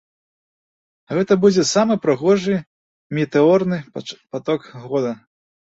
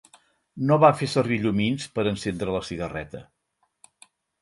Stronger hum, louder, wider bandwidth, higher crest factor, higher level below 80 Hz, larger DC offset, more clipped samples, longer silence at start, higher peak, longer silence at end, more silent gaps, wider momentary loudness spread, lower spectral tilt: neither; first, -19 LUFS vs -24 LUFS; second, 8 kHz vs 11.5 kHz; second, 16 dB vs 22 dB; second, -60 dBFS vs -52 dBFS; neither; neither; first, 1.1 s vs 0.55 s; about the same, -2 dBFS vs -4 dBFS; second, 0.65 s vs 1.2 s; first, 2.67-3.10 s vs none; about the same, 13 LU vs 15 LU; about the same, -5.5 dB/octave vs -6.5 dB/octave